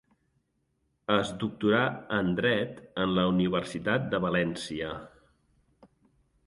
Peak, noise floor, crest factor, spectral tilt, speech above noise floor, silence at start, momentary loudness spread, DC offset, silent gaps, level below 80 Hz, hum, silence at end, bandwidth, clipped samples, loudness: -8 dBFS; -75 dBFS; 22 dB; -6 dB/octave; 47 dB; 1.1 s; 10 LU; under 0.1%; none; -58 dBFS; none; 1.4 s; 11.5 kHz; under 0.1%; -29 LUFS